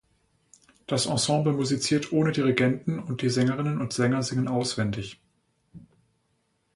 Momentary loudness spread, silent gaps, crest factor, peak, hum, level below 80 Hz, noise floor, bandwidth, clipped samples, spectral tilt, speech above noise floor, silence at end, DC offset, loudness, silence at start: 7 LU; none; 20 dB; -6 dBFS; none; -60 dBFS; -72 dBFS; 11.5 kHz; under 0.1%; -5 dB/octave; 47 dB; 0.95 s; under 0.1%; -26 LUFS; 0.9 s